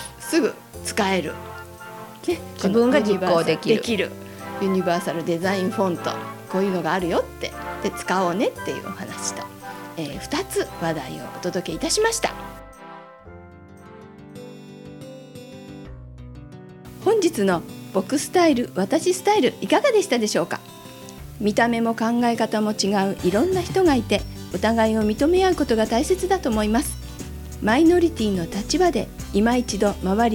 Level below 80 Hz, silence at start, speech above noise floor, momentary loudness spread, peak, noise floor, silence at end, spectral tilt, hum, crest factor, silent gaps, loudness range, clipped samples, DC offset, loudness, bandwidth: -42 dBFS; 0 s; 22 dB; 21 LU; -4 dBFS; -43 dBFS; 0 s; -4.5 dB/octave; none; 18 dB; none; 8 LU; under 0.1%; under 0.1%; -22 LUFS; 17.5 kHz